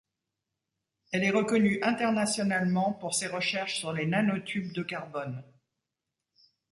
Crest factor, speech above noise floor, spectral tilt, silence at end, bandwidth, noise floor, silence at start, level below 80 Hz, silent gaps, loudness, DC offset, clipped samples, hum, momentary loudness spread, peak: 18 dB; 58 dB; -4.5 dB/octave; 1.3 s; 11.5 kHz; -87 dBFS; 1.1 s; -70 dBFS; none; -29 LUFS; under 0.1%; under 0.1%; none; 10 LU; -14 dBFS